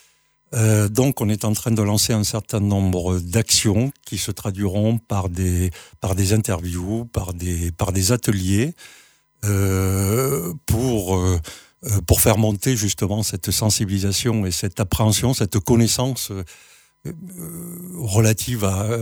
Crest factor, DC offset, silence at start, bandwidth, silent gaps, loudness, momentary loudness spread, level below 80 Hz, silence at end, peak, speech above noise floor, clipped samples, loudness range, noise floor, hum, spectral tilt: 18 dB; under 0.1%; 0.5 s; over 20 kHz; none; -20 LUFS; 11 LU; -38 dBFS; 0 s; -2 dBFS; 39 dB; under 0.1%; 3 LU; -59 dBFS; none; -5 dB/octave